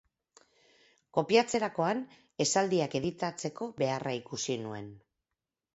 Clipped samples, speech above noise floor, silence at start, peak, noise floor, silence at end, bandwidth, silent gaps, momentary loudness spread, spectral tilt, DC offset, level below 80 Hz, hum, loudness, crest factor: under 0.1%; 58 dB; 1.15 s; -10 dBFS; -89 dBFS; 0.75 s; 8.2 kHz; none; 11 LU; -4 dB/octave; under 0.1%; -70 dBFS; none; -31 LUFS; 22 dB